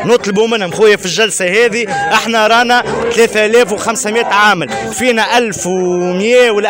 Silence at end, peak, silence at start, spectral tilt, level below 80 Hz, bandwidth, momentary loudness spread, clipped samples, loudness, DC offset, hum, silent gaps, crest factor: 0 s; -2 dBFS; 0 s; -3 dB/octave; -48 dBFS; 16.5 kHz; 5 LU; under 0.1%; -11 LUFS; under 0.1%; none; none; 10 dB